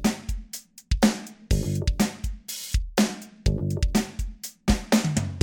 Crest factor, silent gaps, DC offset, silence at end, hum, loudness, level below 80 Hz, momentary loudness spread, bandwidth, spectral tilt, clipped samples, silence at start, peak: 20 dB; none; under 0.1%; 0 s; none; -27 LUFS; -30 dBFS; 12 LU; 17.5 kHz; -5 dB/octave; under 0.1%; 0 s; -4 dBFS